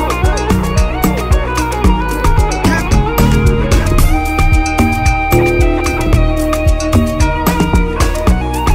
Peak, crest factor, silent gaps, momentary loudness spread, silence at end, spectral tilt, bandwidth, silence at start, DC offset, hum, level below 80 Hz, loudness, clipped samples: 0 dBFS; 10 dB; none; 3 LU; 0 s; -6 dB/octave; 16.5 kHz; 0 s; under 0.1%; none; -14 dBFS; -13 LUFS; under 0.1%